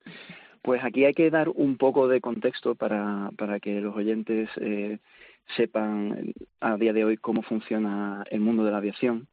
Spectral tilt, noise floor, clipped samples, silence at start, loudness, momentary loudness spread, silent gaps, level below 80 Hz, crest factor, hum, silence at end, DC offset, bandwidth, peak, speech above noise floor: -5.5 dB/octave; -47 dBFS; under 0.1%; 0.05 s; -26 LUFS; 10 LU; none; -72 dBFS; 16 dB; none; 0.05 s; under 0.1%; 4.8 kHz; -10 dBFS; 21 dB